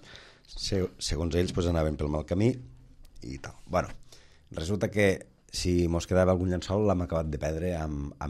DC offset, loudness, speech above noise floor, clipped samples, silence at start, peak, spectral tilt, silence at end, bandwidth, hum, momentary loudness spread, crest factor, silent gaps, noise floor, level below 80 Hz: under 0.1%; -29 LUFS; 23 dB; under 0.1%; 0 s; -12 dBFS; -6 dB/octave; 0 s; 13 kHz; none; 16 LU; 18 dB; none; -51 dBFS; -44 dBFS